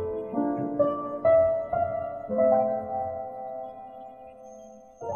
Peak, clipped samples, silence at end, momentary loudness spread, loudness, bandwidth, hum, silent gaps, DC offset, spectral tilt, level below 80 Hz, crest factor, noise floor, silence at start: -12 dBFS; under 0.1%; 0 s; 23 LU; -26 LUFS; 6.8 kHz; none; none; under 0.1%; -9 dB/octave; -60 dBFS; 16 dB; -47 dBFS; 0 s